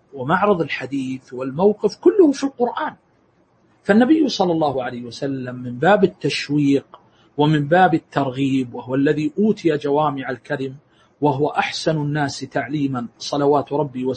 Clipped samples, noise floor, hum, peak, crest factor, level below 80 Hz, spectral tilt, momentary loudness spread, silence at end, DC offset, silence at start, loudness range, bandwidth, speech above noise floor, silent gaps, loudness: under 0.1%; -59 dBFS; none; -2 dBFS; 18 dB; -60 dBFS; -6.5 dB/octave; 11 LU; 0 s; under 0.1%; 0.15 s; 3 LU; 8.8 kHz; 40 dB; none; -20 LUFS